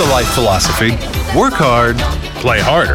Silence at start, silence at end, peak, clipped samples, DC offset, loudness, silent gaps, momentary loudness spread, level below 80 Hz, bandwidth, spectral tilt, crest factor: 0 s; 0 s; -2 dBFS; under 0.1%; under 0.1%; -13 LUFS; none; 6 LU; -24 dBFS; 17.5 kHz; -4.5 dB/octave; 10 dB